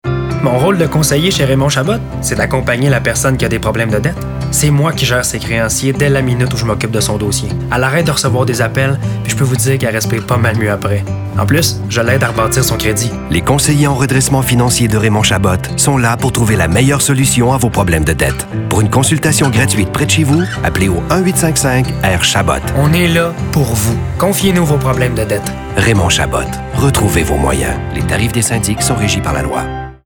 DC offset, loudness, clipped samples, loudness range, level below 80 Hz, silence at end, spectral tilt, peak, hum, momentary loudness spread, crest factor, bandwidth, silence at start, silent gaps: under 0.1%; -12 LUFS; under 0.1%; 2 LU; -28 dBFS; 0.1 s; -4.5 dB/octave; 0 dBFS; none; 5 LU; 12 dB; over 20 kHz; 0.05 s; none